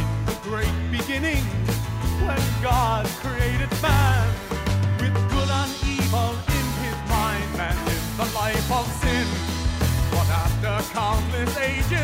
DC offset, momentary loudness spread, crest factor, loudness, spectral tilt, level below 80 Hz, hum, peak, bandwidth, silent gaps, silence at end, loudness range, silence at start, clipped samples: under 0.1%; 5 LU; 16 dB; -23 LUFS; -5 dB/octave; -30 dBFS; none; -6 dBFS; 16 kHz; none; 0 s; 2 LU; 0 s; under 0.1%